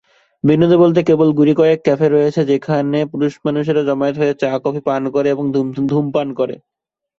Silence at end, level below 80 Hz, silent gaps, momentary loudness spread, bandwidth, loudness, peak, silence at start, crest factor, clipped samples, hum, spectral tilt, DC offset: 0.65 s; -56 dBFS; none; 7 LU; 7.4 kHz; -15 LUFS; -2 dBFS; 0.45 s; 14 dB; under 0.1%; none; -8.5 dB/octave; under 0.1%